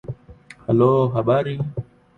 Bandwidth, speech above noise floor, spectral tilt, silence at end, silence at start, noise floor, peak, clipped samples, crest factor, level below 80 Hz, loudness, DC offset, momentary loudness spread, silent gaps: 9.2 kHz; 27 dB; -9.5 dB/octave; 0.35 s; 0.05 s; -46 dBFS; -6 dBFS; under 0.1%; 16 dB; -50 dBFS; -20 LUFS; under 0.1%; 18 LU; none